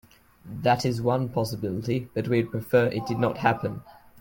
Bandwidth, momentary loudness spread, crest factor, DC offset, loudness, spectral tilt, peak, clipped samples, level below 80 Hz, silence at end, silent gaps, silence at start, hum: 17 kHz; 7 LU; 18 dB; under 0.1%; -26 LUFS; -7 dB/octave; -8 dBFS; under 0.1%; -56 dBFS; 0.25 s; none; 0.45 s; none